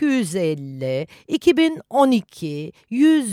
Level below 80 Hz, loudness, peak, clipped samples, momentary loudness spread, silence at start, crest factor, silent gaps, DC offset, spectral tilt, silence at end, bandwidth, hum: -62 dBFS; -20 LUFS; -2 dBFS; under 0.1%; 13 LU; 0 s; 16 dB; none; under 0.1%; -5.5 dB/octave; 0 s; 14.5 kHz; none